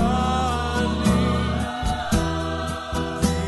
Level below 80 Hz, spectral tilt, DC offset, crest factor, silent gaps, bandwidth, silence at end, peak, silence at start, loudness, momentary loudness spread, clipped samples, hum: -30 dBFS; -5.5 dB/octave; under 0.1%; 16 dB; none; 12 kHz; 0 s; -6 dBFS; 0 s; -23 LUFS; 7 LU; under 0.1%; none